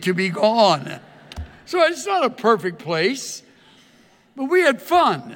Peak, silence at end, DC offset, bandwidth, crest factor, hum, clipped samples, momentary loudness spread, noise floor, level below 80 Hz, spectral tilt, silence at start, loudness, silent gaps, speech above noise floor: -2 dBFS; 0 s; under 0.1%; 17.5 kHz; 18 dB; none; under 0.1%; 20 LU; -54 dBFS; -52 dBFS; -4.5 dB/octave; 0 s; -19 LUFS; none; 35 dB